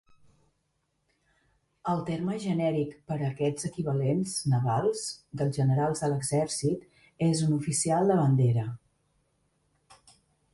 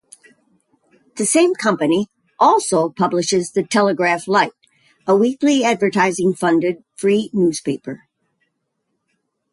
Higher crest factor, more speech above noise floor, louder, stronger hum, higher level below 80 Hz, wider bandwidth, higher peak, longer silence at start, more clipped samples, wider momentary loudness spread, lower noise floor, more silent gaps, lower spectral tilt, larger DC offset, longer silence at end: about the same, 16 dB vs 16 dB; second, 49 dB vs 56 dB; second, -28 LUFS vs -17 LUFS; neither; about the same, -62 dBFS vs -64 dBFS; about the same, 11.5 kHz vs 11.5 kHz; second, -12 dBFS vs -2 dBFS; first, 1.85 s vs 1.15 s; neither; about the same, 9 LU vs 9 LU; about the same, -76 dBFS vs -73 dBFS; neither; first, -6 dB/octave vs -4.5 dB/octave; neither; first, 1.75 s vs 1.55 s